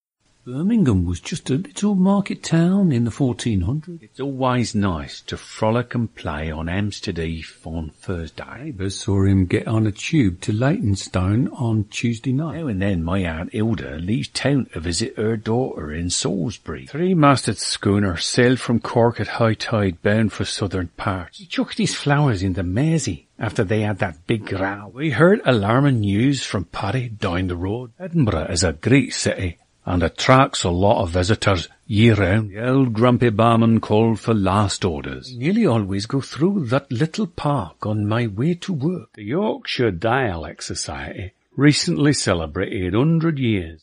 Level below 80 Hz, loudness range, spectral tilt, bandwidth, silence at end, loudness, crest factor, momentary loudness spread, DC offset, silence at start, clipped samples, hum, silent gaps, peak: -42 dBFS; 5 LU; -6 dB/octave; 11 kHz; 0.05 s; -20 LUFS; 20 dB; 11 LU; under 0.1%; 0.45 s; under 0.1%; none; none; 0 dBFS